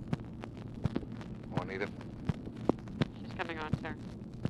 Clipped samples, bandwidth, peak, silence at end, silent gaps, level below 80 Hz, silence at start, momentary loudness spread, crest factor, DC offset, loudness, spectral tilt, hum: under 0.1%; 11 kHz; -10 dBFS; 0 s; none; -52 dBFS; 0 s; 9 LU; 28 dB; under 0.1%; -39 LUFS; -7.5 dB/octave; none